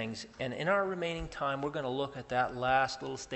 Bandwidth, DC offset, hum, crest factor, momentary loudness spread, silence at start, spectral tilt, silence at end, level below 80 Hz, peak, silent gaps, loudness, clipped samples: 8.2 kHz; under 0.1%; none; 18 dB; 9 LU; 0 s; -4.5 dB/octave; 0 s; -56 dBFS; -14 dBFS; none; -33 LUFS; under 0.1%